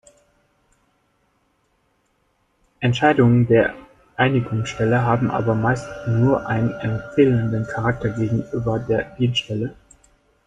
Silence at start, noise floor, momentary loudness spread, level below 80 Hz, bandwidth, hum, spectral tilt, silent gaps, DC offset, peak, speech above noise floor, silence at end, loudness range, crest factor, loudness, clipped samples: 2.8 s; -66 dBFS; 9 LU; -48 dBFS; 8 kHz; none; -7 dB/octave; none; under 0.1%; -2 dBFS; 47 dB; 0.75 s; 3 LU; 18 dB; -20 LUFS; under 0.1%